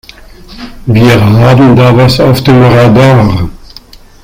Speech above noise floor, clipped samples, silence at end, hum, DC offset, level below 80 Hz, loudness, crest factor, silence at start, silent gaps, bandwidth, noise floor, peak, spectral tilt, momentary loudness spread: 29 dB; 4%; 0.65 s; none; under 0.1%; -28 dBFS; -5 LUFS; 6 dB; 0.5 s; none; 16 kHz; -32 dBFS; 0 dBFS; -7.5 dB/octave; 8 LU